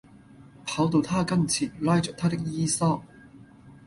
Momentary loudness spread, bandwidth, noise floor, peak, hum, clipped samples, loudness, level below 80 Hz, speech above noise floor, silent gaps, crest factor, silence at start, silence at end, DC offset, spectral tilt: 6 LU; 11.5 kHz; -51 dBFS; -10 dBFS; none; under 0.1%; -26 LUFS; -56 dBFS; 26 dB; none; 16 dB; 0.4 s; 0.15 s; under 0.1%; -5 dB/octave